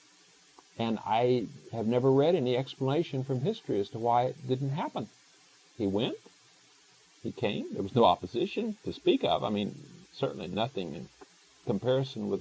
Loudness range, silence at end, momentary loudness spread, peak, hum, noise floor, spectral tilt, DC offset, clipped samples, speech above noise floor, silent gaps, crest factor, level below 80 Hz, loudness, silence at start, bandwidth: 5 LU; 0 s; 15 LU; -10 dBFS; none; -61 dBFS; -7 dB/octave; under 0.1%; under 0.1%; 31 dB; none; 20 dB; -64 dBFS; -30 LUFS; 0.75 s; 8 kHz